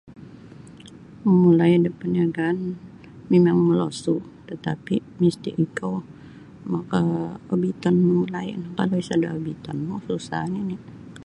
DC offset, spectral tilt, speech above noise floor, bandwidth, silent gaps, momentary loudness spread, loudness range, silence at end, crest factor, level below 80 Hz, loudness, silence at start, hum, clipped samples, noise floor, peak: under 0.1%; -8 dB/octave; 22 dB; 11 kHz; none; 14 LU; 6 LU; 0 s; 16 dB; -58 dBFS; -23 LUFS; 0.05 s; none; under 0.1%; -44 dBFS; -6 dBFS